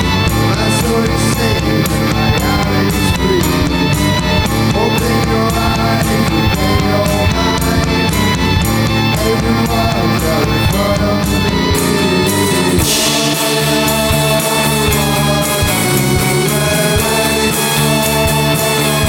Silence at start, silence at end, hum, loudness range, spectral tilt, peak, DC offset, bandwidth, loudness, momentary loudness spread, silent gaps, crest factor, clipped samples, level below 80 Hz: 0 s; 0 s; none; 1 LU; -4.5 dB/octave; 0 dBFS; under 0.1%; 19 kHz; -13 LUFS; 2 LU; none; 12 dB; under 0.1%; -24 dBFS